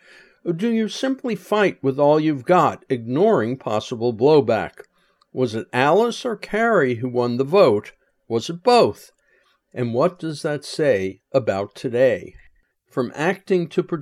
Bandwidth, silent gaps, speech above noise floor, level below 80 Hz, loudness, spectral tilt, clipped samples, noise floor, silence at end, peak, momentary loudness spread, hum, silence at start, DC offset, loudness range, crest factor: 13.5 kHz; none; 42 dB; -62 dBFS; -20 LUFS; -6 dB/octave; under 0.1%; -62 dBFS; 0 s; -2 dBFS; 11 LU; none; 0.45 s; under 0.1%; 4 LU; 18 dB